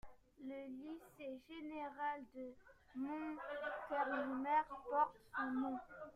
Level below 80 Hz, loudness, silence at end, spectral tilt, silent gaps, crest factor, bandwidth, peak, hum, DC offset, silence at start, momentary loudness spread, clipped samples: -74 dBFS; -44 LUFS; 0 s; -6 dB/octave; none; 20 dB; 14.5 kHz; -24 dBFS; none; under 0.1%; 0.05 s; 14 LU; under 0.1%